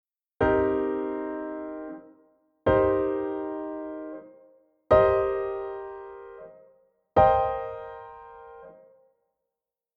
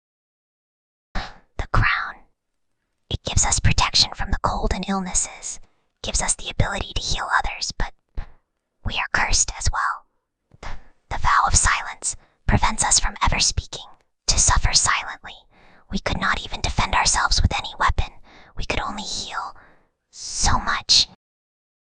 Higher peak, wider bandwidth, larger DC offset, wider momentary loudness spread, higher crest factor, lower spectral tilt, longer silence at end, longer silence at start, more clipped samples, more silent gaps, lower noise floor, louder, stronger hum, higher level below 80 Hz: second, -8 dBFS vs 0 dBFS; second, 5.2 kHz vs 10 kHz; second, under 0.1% vs 0.2%; first, 24 LU vs 18 LU; about the same, 20 dB vs 22 dB; first, -9 dB/octave vs -2 dB/octave; first, 1.25 s vs 0.95 s; second, 0.4 s vs 1.15 s; neither; neither; first, -88 dBFS vs -74 dBFS; second, -26 LUFS vs -21 LUFS; neither; second, -48 dBFS vs -30 dBFS